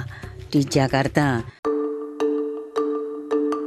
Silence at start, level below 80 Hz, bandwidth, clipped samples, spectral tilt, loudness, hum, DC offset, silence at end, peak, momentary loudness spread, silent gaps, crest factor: 0 s; -48 dBFS; 14 kHz; under 0.1%; -6 dB/octave; -23 LUFS; none; under 0.1%; 0 s; -4 dBFS; 8 LU; 1.59-1.63 s; 20 dB